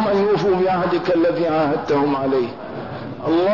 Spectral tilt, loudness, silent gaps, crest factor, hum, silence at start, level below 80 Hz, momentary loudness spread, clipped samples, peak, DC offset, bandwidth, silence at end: -7.5 dB/octave; -19 LUFS; none; 10 dB; none; 0 s; -54 dBFS; 12 LU; under 0.1%; -8 dBFS; 0.4%; 6 kHz; 0 s